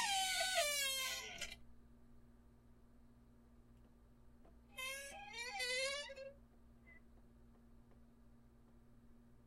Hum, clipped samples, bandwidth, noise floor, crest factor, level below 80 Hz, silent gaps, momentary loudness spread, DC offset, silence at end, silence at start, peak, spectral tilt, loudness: none; under 0.1%; 16 kHz; -65 dBFS; 22 dB; -68 dBFS; none; 22 LU; under 0.1%; 0.05 s; 0 s; -26 dBFS; 0.5 dB/octave; -41 LUFS